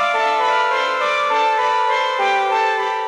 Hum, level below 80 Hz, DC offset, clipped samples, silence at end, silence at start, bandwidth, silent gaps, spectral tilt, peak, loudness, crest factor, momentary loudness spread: none; -78 dBFS; under 0.1%; under 0.1%; 0 s; 0 s; 12 kHz; none; -0.5 dB/octave; -6 dBFS; -17 LUFS; 12 dB; 1 LU